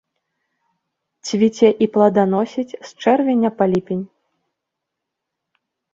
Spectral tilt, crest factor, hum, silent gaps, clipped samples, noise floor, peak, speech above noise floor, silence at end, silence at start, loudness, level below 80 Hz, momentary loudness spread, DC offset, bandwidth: -6.5 dB/octave; 18 dB; none; none; under 0.1%; -80 dBFS; -2 dBFS; 64 dB; 1.9 s; 1.25 s; -17 LUFS; -62 dBFS; 12 LU; under 0.1%; 7.8 kHz